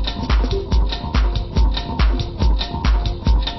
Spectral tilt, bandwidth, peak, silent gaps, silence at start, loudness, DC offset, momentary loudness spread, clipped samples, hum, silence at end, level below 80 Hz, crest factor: -6.5 dB/octave; 6 kHz; -4 dBFS; none; 0 s; -20 LUFS; under 0.1%; 1 LU; under 0.1%; none; 0 s; -18 dBFS; 12 dB